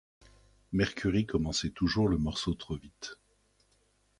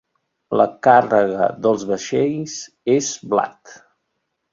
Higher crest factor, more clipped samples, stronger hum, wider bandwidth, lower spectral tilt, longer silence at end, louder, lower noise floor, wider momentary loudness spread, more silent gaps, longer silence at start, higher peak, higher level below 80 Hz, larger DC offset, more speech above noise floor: about the same, 20 dB vs 18 dB; neither; first, 50 Hz at -55 dBFS vs none; first, 11.5 kHz vs 7.6 kHz; about the same, -5.5 dB/octave vs -4.5 dB/octave; first, 1.05 s vs 0.8 s; second, -31 LUFS vs -18 LUFS; second, -70 dBFS vs -74 dBFS; about the same, 14 LU vs 13 LU; neither; first, 0.7 s vs 0.5 s; second, -14 dBFS vs -2 dBFS; first, -48 dBFS vs -62 dBFS; neither; second, 39 dB vs 56 dB